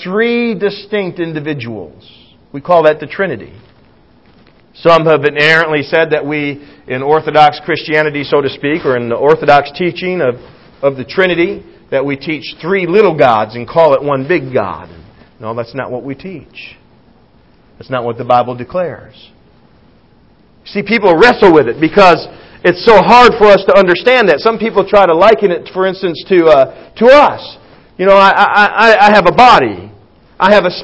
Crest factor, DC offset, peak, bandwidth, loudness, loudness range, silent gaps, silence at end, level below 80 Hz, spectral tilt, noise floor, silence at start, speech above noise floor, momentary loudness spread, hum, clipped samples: 10 dB; under 0.1%; 0 dBFS; 8 kHz; -10 LUFS; 12 LU; none; 0 s; -44 dBFS; -6 dB/octave; -47 dBFS; 0 s; 37 dB; 16 LU; none; 2%